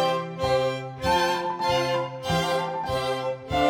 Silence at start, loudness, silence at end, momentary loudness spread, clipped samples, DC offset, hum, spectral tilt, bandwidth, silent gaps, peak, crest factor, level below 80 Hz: 0 s; -26 LUFS; 0 s; 5 LU; under 0.1%; under 0.1%; none; -4.5 dB/octave; 17.5 kHz; none; -10 dBFS; 16 dB; -46 dBFS